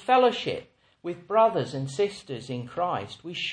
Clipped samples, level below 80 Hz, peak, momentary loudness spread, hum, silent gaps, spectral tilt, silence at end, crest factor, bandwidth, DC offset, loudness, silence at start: under 0.1%; -66 dBFS; -10 dBFS; 16 LU; none; none; -5.5 dB/octave; 0 s; 18 dB; 10 kHz; under 0.1%; -27 LUFS; 0 s